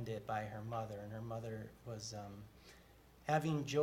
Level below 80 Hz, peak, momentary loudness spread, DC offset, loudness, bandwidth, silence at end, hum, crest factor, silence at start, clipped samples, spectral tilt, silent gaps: -68 dBFS; -20 dBFS; 21 LU; under 0.1%; -43 LUFS; 16.5 kHz; 0 s; none; 22 dB; 0 s; under 0.1%; -6 dB/octave; none